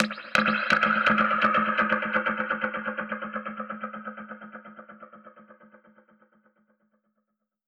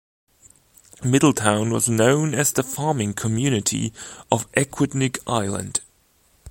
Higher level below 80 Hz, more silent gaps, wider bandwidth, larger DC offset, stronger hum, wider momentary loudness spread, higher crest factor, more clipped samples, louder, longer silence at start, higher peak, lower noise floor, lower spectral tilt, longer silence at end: second, -66 dBFS vs -54 dBFS; neither; second, 12 kHz vs 17 kHz; neither; neither; first, 21 LU vs 9 LU; about the same, 26 dB vs 22 dB; neither; second, -25 LUFS vs -21 LUFS; second, 0 s vs 1 s; second, -4 dBFS vs 0 dBFS; first, -79 dBFS vs -60 dBFS; about the same, -4.5 dB/octave vs -4.5 dB/octave; first, 2.15 s vs 0 s